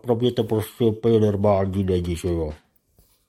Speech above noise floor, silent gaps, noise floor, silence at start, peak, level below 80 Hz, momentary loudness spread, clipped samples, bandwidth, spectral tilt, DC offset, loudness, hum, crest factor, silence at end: 40 dB; none; -61 dBFS; 0.05 s; -6 dBFS; -46 dBFS; 7 LU; under 0.1%; 14 kHz; -7.5 dB/octave; under 0.1%; -22 LUFS; none; 16 dB; 0.75 s